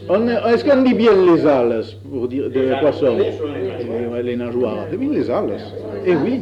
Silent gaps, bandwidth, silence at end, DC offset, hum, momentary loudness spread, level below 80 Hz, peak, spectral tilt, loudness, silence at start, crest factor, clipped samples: none; 7.8 kHz; 0 s; under 0.1%; none; 11 LU; -52 dBFS; -2 dBFS; -8 dB/octave; -17 LUFS; 0 s; 14 dB; under 0.1%